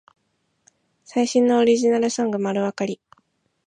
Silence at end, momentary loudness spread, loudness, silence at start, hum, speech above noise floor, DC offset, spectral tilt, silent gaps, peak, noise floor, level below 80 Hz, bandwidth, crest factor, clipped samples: 0.75 s; 11 LU; -21 LUFS; 1.15 s; none; 51 dB; under 0.1%; -5 dB/octave; none; -6 dBFS; -71 dBFS; -72 dBFS; 10 kHz; 16 dB; under 0.1%